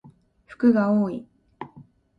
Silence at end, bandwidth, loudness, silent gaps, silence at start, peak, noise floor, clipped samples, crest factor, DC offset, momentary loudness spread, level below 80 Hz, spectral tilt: 0.35 s; 5.2 kHz; -22 LUFS; none; 0.5 s; -8 dBFS; -52 dBFS; under 0.1%; 18 dB; under 0.1%; 22 LU; -64 dBFS; -9.5 dB/octave